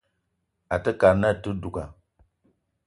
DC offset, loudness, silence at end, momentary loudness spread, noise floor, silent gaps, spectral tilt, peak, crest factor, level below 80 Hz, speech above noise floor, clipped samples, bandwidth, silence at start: under 0.1%; -24 LUFS; 0.95 s; 16 LU; -76 dBFS; none; -7.5 dB/octave; -4 dBFS; 22 dB; -46 dBFS; 53 dB; under 0.1%; 11.5 kHz; 0.7 s